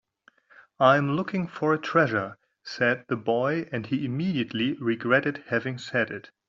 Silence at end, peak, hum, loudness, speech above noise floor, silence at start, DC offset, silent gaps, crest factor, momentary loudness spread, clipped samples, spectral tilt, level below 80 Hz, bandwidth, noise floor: 0.25 s; -6 dBFS; none; -26 LUFS; 35 dB; 0.8 s; under 0.1%; none; 20 dB; 8 LU; under 0.1%; -4.5 dB/octave; -68 dBFS; 7.6 kHz; -61 dBFS